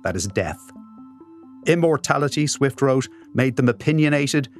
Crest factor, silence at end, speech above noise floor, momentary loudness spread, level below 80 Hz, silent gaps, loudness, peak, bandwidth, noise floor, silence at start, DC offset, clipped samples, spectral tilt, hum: 20 dB; 0 s; 24 dB; 8 LU; -54 dBFS; none; -21 LUFS; 0 dBFS; 13.5 kHz; -44 dBFS; 0.05 s; under 0.1%; under 0.1%; -5.5 dB/octave; none